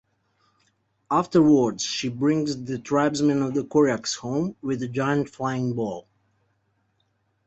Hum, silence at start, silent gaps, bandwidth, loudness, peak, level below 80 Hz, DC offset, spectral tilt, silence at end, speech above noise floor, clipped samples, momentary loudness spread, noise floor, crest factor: none; 1.1 s; none; 8.2 kHz; -24 LUFS; -8 dBFS; -62 dBFS; under 0.1%; -5.5 dB/octave; 1.45 s; 47 dB; under 0.1%; 9 LU; -70 dBFS; 18 dB